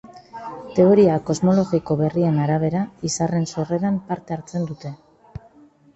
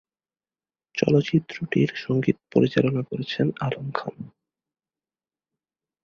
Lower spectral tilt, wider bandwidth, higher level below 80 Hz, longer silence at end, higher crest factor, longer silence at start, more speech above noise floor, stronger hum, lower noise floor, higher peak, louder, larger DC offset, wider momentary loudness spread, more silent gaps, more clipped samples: about the same, -7 dB/octave vs -7.5 dB/octave; first, 8.2 kHz vs 7 kHz; first, -54 dBFS vs -60 dBFS; second, 0.6 s vs 1.75 s; about the same, 18 dB vs 22 dB; second, 0.05 s vs 0.95 s; second, 32 dB vs over 66 dB; neither; second, -51 dBFS vs under -90 dBFS; about the same, -4 dBFS vs -4 dBFS; first, -20 LUFS vs -24 LUFS; neither; first, 21 LU vs 12 LU; neither; neither